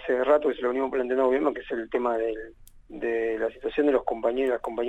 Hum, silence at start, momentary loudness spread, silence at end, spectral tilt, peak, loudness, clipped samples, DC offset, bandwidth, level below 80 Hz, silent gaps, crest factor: none; 0 s; 10 LU; 0 s; -6 dB/octave; -10 dBFS; -26 LUFS; under 0.1%; under 0.1%; 9 kHz; -54 dBFS; none; 16 dB